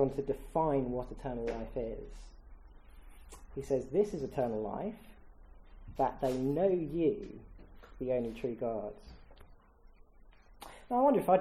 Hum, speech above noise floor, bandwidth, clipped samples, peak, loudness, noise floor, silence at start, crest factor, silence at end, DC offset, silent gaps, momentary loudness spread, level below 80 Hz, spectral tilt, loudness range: none; 26 dB; 15 kHz; under 0.1%; -14 dBFS; -34 LUFS; -59 dBFS; 0 s; 20 dB; 0 s; under 0.1%; none; 22 LU; -52 dBFS; -8 dB/octave; 6 LU